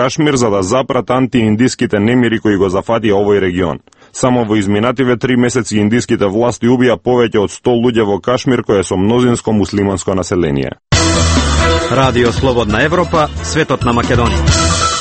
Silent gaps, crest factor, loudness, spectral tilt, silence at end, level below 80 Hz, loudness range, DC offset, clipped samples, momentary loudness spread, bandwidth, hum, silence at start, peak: none; 12 dB; -13 LUFS; -5 dB/octave; 0 s; -26 dBFS; 1 LU; under 0.1%; under 0.1%; 3 LU; 8.8 kHz; none; 0 s; 0 dBFS